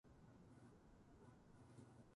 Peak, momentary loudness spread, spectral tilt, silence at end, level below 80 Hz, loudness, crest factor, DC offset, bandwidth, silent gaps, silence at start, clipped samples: -48 dBFS; 3 LU; -7 dB/octave; 0 s; -76 dBFS; -67 LUFS; 18 dB; under 0.1%; 11 kHz; none; 0.05 s; under 0.1%